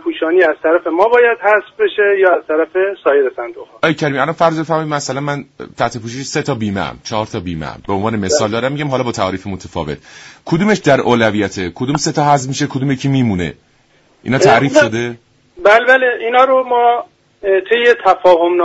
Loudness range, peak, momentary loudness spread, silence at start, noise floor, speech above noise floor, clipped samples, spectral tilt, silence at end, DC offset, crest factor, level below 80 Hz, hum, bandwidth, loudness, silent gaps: 7 LU; 0 dBFS; 13 LU; 0.05 s; -53 dBFS; 39 dB; under 0.1%; -5 dB/octave; 0 s; under 0.1%; 14 dB; -48 dBFS; none; 8 kHz; -14 LUFS; none